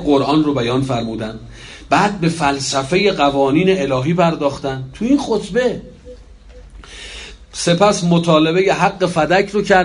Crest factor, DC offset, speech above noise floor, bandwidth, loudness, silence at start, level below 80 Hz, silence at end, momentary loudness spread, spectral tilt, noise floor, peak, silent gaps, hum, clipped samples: 16 dB; under 0.1%; 24 dB; 11 kHz; -16 LUFS; 0 s; -42 dBFS; 0 s; 17 LU; -5.5 dB/octave; -39 dBFS; 0 dBFS; none; none; under 0.1%